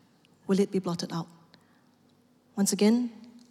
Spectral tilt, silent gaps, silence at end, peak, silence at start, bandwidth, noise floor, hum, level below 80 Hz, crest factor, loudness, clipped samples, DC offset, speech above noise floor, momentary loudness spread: -5 dB/octave; none; 0.2 s; -14 dBFS; 0.5 s; 15 kHz; -63 dBFS; none; -80 dBFS; 18 dB; -28 LUFS; under 0.1%; under 0.1%; 37 dB; 17 LU